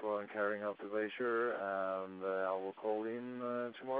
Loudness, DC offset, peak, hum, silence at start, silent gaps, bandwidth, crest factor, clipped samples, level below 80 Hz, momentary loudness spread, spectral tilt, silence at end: -39 LUFS; under 0.1%; -24 dBFS; none; 0 s; none; 4 kHz; 14 dB; under 0.1%; -86 dBFS; 5 LU; -3.5 dB/octave; 0 s